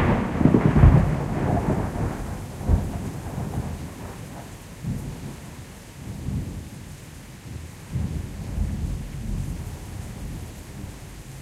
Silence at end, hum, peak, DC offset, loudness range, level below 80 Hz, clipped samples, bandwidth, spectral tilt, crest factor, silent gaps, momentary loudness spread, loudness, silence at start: 0 s; none; -2 dBFS; under 0.1%; 13 LU; -32 dBFS; under 0.1%; 15.5 kHz; -7.5 dB/octave; 24 dB; none; 20 LU; -25 LUFS; 0 s